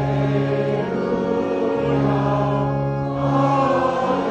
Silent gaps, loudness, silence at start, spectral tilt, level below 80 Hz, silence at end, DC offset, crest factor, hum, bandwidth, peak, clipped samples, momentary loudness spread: none; -20 LUFS; 0 s; -8.5 dB/octave; -44 dBFS; 0 s; under 0.1%; 14 dB; none; 7.6 kHz; -6 dBFS; under 0.1%; 4 LU